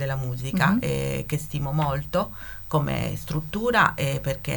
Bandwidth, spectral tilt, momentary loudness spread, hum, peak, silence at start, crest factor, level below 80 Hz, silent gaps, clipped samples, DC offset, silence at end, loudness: 19.5 kHz; -6 dB/octave; 9 LU; none; -4 dBFS; 0 s; 20 dB; -42 dBFS; none; under 0.1%; under 0.1%; 0 s; -25 LUFS